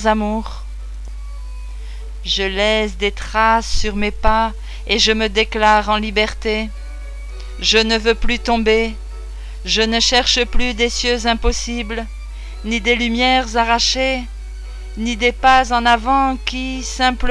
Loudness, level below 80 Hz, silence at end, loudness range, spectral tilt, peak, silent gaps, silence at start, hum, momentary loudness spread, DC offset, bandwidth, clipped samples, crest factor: -16 LUFS; -26 dBFS; 0 s; 3 LU; -3 dB/octave; -2 dBFS; none; 0 s; 50 Hz at -30 dBFS; 19 LU; under 0.1%; 11 kHz; under 0.1%; 16 dB